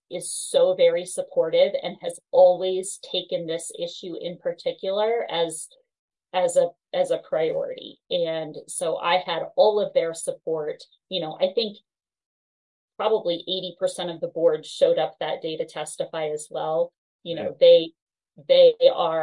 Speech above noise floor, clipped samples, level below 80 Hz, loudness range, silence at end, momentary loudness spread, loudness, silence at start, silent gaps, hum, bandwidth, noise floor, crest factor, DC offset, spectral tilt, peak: over 67 dB; under 0.1%; -78 dBFS; 6 LU; 0 s; 14 LU; -23 LUFS; 0.1 s; 5.99-6.08 s, 12.26-12.88 s, 16.98-17.19 s, 18.02-18.07 s; none; 11.5 kHz; under -90 dBFS; 18 dB; under 0.1%; -3 dB/octave; -4 dBFS